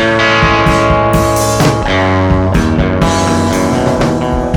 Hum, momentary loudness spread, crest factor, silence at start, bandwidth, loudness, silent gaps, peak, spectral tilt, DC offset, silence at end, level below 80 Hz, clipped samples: none; 3 LU; 10 dB; 0 s; 18.5 kHz; -11 LUFS; none; 0 dBFS; -5.5 dB/octave; under 0.1%; 0 s; -22 dBFS; under 0.1%